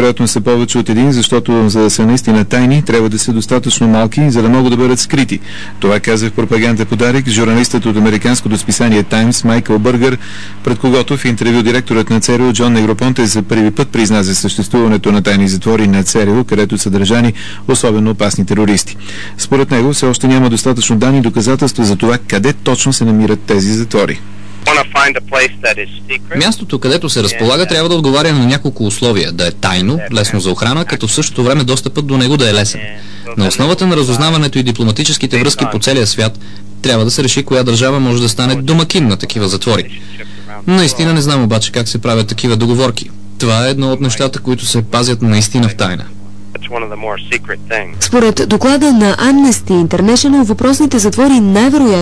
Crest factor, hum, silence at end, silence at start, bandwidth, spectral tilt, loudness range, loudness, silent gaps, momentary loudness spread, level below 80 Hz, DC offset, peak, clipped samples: 10 dB; 50 Hz at -35 dBFS; 0 s; 0 s; 11 kHz; -4.5 dB/octave; 3 LU; -11 LUFS; none; 7 LU; -40 dBFS; 7%; 0 dBFS; under 0.1%